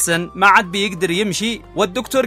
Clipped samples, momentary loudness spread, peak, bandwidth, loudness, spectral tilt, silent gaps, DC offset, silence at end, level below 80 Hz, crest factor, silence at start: under 0.1%; 9 LU; 0 dBFS; 16 kHz; -16 LUFS; -3 dB/octave; none; under 0.1%; 0 s; -46 dBFS; 18 dB; 0 s